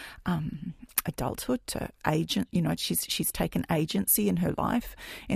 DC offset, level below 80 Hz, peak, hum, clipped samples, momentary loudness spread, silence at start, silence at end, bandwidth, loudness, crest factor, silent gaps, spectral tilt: under 0.1%; -48 dBFS; -6 dBFS; none; under 0.1%; 9 LU; 0 s; 0 s; 15.5 kHz; -29 LUFS; 24 dB; none; -4.5 dB/octave